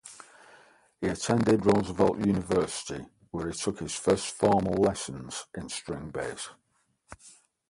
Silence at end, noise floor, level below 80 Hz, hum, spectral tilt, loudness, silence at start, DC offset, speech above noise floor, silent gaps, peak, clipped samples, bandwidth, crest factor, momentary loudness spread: 0.4 s; -71 dBFS; -54 dBFS; none; -5 dB/octave; -28 LUFS; 0.05 s; under 0.1%; 43 dB; none; -10 dBFS; under 0.1%; 11.5 kHz; 20 dB; 16 LU